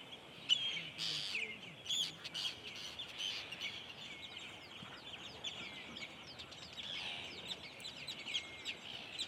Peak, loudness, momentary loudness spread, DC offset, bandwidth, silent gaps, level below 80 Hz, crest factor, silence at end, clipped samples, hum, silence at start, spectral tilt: -20 dBFS; -42 LUFS; 12 LU; under 0.1%; 16 kHz; none; -74 dBFS; 26 dB; 0 s; under 0.1%; none; 0 s; -1 dB/octave